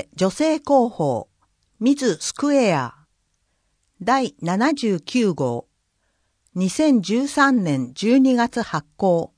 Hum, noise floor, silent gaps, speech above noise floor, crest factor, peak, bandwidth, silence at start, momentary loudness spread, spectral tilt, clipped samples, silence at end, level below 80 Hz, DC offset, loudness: none; -69 dBFS; none; 50 dB; 16 dB; -4 dBFS; 10.5 kHz; 0.15 s; 8 LU; -5.5 dB/octave; under 0.1%; 0.1 s; -60 dBFS; under 0.1%; -20 LUFS